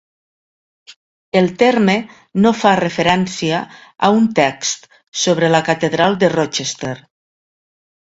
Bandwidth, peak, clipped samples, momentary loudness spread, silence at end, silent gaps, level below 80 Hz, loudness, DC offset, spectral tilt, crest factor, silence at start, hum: 8 kHz; 0 dBFS; under 0.1%; 11 LU; 1.1 s; 0.96-1.32 s, 5.08-5.12 s; -54 dBFS; -16 LUFS; under 0.1%; -4.5 dB/octave; 16 dB; 0.9 s; none